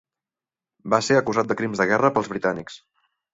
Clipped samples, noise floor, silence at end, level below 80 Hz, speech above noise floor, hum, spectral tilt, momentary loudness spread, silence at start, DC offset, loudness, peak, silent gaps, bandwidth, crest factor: under 0.1%; under -90 dBFS; 0.55 s; -60 dBFS; over 68 dB; none; -5 dB/octave; 13 LU; 0.85 s; under 0.1%; -22 LUFS; -2 dBFS; none; 8 kHz; 22 dB